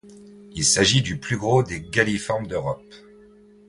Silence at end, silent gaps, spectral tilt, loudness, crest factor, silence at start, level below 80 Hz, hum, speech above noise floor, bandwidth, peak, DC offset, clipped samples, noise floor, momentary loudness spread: 0.7 s; none; -3.5 dB/octave; -21 LUFS; 20 dB; 0.05 s; -48 dBFS; none; 28 dB; 11.5 kHz; -2 dBFS; under 0.1%; under 0.1%; -50 dBFS; 12 LU